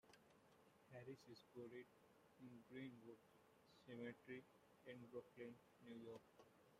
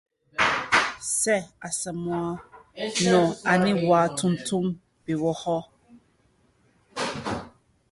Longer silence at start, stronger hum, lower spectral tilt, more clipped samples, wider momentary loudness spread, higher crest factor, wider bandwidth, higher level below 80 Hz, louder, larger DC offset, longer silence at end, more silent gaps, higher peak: second, 0.05 s vs 0.35 s; neither; first, -6 dB/octave vs -4 dB/octave; neither; second, 10 LU vs 13 LU; about the same, 20 dB vs 20 dB; first, 15 kHz vs 12 kHz; second, under -90 dBFS vs -58 dBFS; second, -61 LUFS vs -25 LUFS; neither; second, 0 s vs 0.45 s; neither; second, -42 dBFS vs -6 dBFS